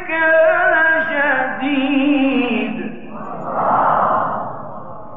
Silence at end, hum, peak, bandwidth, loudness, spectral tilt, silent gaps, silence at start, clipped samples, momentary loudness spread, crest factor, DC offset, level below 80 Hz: 0 s; none; -4 dBFS; 3.9 kHz; -16 LUFS; -8.5 dB/octave; none; 0 s; under 0.1%; 17 LU; 12 dB; 2%; -56 dBFS